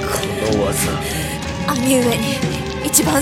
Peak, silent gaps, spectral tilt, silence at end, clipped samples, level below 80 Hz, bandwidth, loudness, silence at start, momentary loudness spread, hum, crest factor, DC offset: 0 dBFS; none; -4 dB/octave; 0 s; under 0.1%; -34 dBFS; 17 kHz; -18 LUFS; 0 s; 7 LU; none; 18 dB; under 0.1%